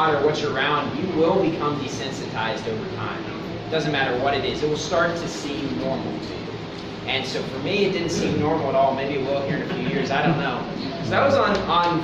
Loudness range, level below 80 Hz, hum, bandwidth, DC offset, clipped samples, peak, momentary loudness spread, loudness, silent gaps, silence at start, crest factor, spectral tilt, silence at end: 3 LU; -48 dBFS; none; 10.5 kHz; under 0.1%; under 0.1%; -6 dBFS; 9 LU; -23 LUFS; none; 0 s; 16 dB; -5.5 dB/octave; 0 s